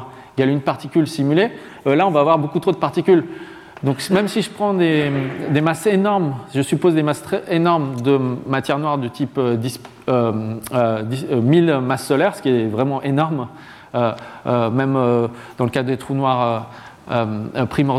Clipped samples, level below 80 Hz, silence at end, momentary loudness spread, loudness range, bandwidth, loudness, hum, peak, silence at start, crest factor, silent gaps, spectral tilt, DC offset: under 0.1%; -56 dBFS; 0 s; 8 LU; 2 LU; 15 kHz; -19 LUFS; none; -2 dBFS; 0 s; 16 dB; none; -7 dB/octave; under 0.1%